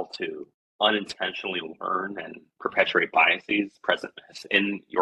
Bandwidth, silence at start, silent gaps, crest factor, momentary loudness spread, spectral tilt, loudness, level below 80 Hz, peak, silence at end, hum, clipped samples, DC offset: 12 kHz; 0 s; 0.54-0.79 s; 22 dB; 16 LU; -4 dB/octave; -25 LUFS; -72 dBFS; -4 dBFS; 0 s; none; under 0.1%; under 0.1%